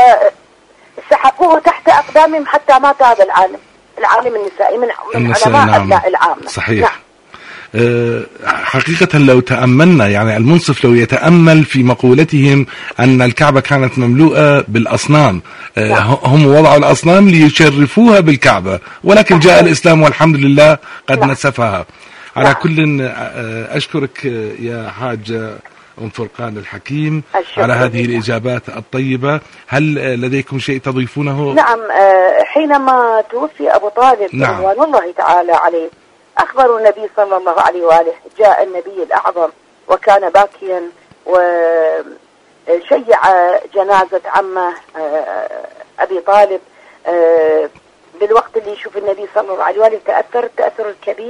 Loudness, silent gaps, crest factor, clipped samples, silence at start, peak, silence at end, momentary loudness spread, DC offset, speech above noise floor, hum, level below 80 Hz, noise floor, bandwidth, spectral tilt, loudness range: -11 LUFS; none; 10 dB; 0.6%; 0 s; 0 dBFS; 0 s; 14 LU; under 0.1%; 35 dB; none; -46 dBFS; -45 dBFS; 11 kHz; -6.5 dB/octave; 8 LU